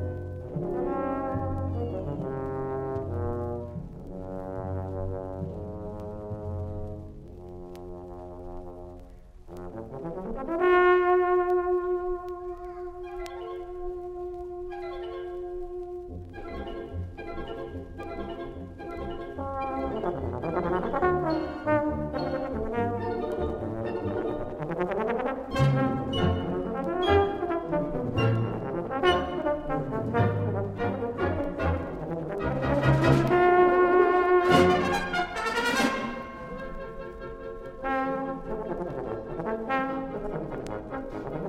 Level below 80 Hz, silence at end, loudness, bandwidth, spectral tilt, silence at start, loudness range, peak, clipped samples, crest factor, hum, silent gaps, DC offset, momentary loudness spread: -44 dBFS; 0 s; -28 LUFS; 13 kHz; -7 dB/octave; 0 s; 14 LU; -8 dBFS; under 0.1%; 22 dB; none; none; under 0.1%; 17 LU